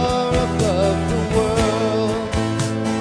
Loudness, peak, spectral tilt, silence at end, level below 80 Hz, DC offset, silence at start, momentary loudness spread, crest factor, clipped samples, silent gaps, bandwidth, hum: -19 LUFS; -4 dBFS; -5.5 dB/octave; 0 s; -32 dBFS; under 0.1%; 0 s; 4 LU; 14 dB; under 0.1%; none; 10.5 kHz; none